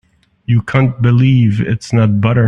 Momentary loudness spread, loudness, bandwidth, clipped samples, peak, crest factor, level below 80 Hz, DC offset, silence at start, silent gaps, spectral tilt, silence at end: 6 LU; -13 LUFS; 8.2 kHz; under 0.1%; 0 dBFS; 12 dB; -42 dBFS; under 0.1%; 0.5 s; none; -8 dB/octave; 0 s